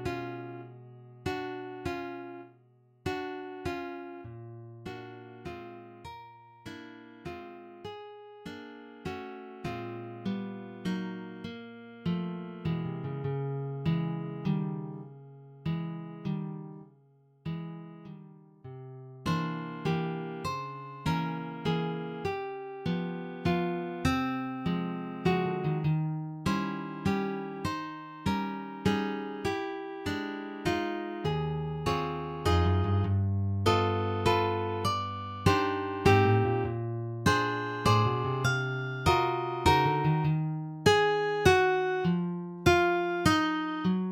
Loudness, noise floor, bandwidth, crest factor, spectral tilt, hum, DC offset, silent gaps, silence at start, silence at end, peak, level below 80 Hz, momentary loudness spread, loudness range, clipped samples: -31 LUFS; -63 dBFS; 16.5 kHz; 22 dB; -6.5 dB/octave; none; under 0.1%; none; 0 s; 0 s; -8 dBFS; -52 dBFS; 20 LU; 15 LU; under 0.1%